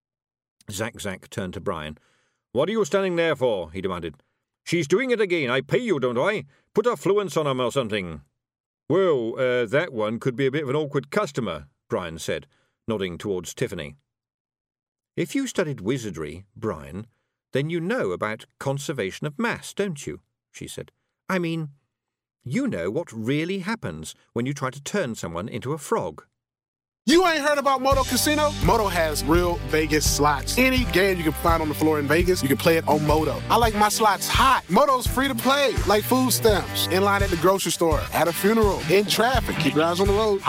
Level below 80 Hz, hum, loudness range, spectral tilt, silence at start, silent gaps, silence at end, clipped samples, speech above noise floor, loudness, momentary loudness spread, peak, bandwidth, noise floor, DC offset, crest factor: -38 dBFS; none; 10 LU; -4.5 dB/octave; 0.7 s; 8.60-8.78 s, 14.34-14.45 s, 14.61-14.65 s, 14.88-14.92 s, 26.68-26.74 s; 0 s; under 0.1%; 57 dB; -23 LUFS; 13 LU; -8 dBFS; 16 kHz; -80 dBFS; under 0.1%; 16 dB